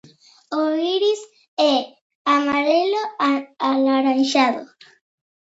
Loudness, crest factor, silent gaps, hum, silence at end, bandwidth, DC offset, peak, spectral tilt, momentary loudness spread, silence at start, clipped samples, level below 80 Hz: -20 LUFS; 18 dB; 1.48-1.57 s, 2.01-2.25 s; none; 0.9 s; 8 kHz; under 0.1%; -2 dBFS; -3 dB/octave; 10 LU; 0.5 s; under 0.1%; -70 dBFS